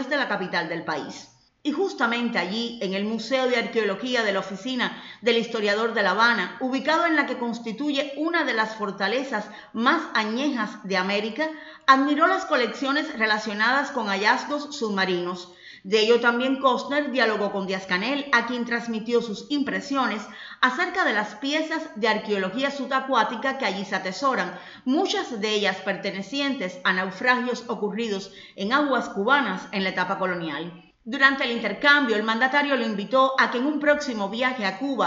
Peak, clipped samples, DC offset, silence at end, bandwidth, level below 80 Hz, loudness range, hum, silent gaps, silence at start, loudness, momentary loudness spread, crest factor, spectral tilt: -2 dBFS; under 0.1%; under 0.1%; 0 s; 7.8 kHz; -70 dBFS; 3 LU; none; none; 0 s; -24 LUFS; 9 LU; 22 dB; -4 dB/octave